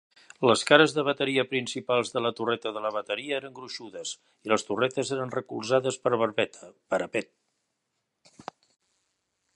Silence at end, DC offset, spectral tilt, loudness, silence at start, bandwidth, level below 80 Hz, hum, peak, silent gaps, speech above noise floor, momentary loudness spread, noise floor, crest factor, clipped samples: 2.35 s; under 0.1%; -4 dB/octave; -27 LUFS; 0.4 s; 11.5 kHz; -74 dBFS; none; -2 dBFS; none; 53 dB; 16 LU; -80 dBFS; 26 dB; under 0.1%